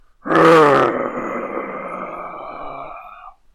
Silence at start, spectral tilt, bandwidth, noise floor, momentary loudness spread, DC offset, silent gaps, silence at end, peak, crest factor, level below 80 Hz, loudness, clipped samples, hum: 0.25 s; -6 dB/octave; 13.5 kHz; -40 dBFS; 21 LU; under 0.1%; none; 0.25 s; -4 dBFS; 14 dB; -52 dBFS; -16 LUFS; under 0.1%; none